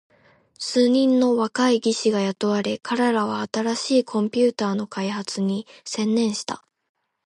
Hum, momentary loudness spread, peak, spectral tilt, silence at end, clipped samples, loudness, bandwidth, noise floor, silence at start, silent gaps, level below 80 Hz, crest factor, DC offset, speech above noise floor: none; 9 LU; -8 dBFS; -4.5 dB/octave; 0.65 s; under 0.1%; -22 LUFS; 11.5 kHz; -56 dBFS; 0.6 s; none; -72 dBFS; 14 dB; under 0.1%; 35 dB